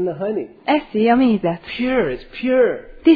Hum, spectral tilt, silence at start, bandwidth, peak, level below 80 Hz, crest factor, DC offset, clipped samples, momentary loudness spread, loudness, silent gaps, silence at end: none; -9 dB/octave; 0 s; 5 kHz; -2 dBFS; -46 dBFS; 16 dB; under 0.1%; under 0.1%; 9 LU; -19 LUFS; none; 0 s